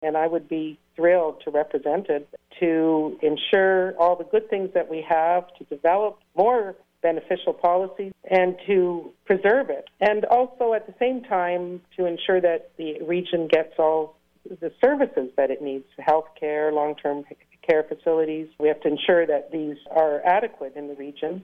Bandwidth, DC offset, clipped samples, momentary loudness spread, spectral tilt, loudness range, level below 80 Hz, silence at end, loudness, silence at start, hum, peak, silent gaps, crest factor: 5.4 kHz; under 0.1%; under 0.1%; 11 LU; -7.5 dB/octave; 2 LU; -66 dBFS; 0 s; -23 LUFS; 0 s; none; -8 dBFS; none; 16 dB